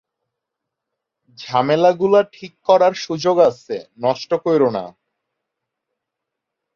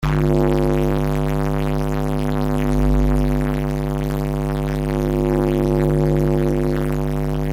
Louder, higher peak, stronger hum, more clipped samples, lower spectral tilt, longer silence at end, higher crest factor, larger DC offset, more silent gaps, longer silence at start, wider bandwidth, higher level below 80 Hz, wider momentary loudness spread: first, -17 LUFS vs -20 LUFS; about the same, -2 dBFS vs -4 dBFS; neither; neither; second, -6 dB/octave vs -8 dB/octave; first, 1.85 s vs 0 s; about the same, 18 dB vs 14 dB; neither; neither; first, 1.4 s vs 0 s; second, 7.2 kHz vs 16 kHz; second, -64 dBFS vs -24 dBFS; first, 14 LU vs 5 LU